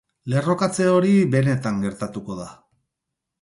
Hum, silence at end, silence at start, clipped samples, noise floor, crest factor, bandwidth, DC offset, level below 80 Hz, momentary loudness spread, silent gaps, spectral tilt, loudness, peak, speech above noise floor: none; 0.9 s; 0.25 s; under 0.1%; -82 dBFS; 14 dB; 11.5 kHz; under 0.1%; -56 dBFS; 16 LU; none; -7 dB/octave; -21 LUFS; -6 dBFS; 62 dB